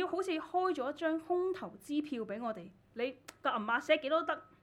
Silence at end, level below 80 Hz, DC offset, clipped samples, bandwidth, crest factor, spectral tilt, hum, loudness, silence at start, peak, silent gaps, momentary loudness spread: 0.2 s; -76 dBFS; under 0.1%; under 0.1%; 14 kHz; 20 dB; -4.5 dB/octave; none; -35 LUFS; 0 s; -16 dBFS; none; 9 LU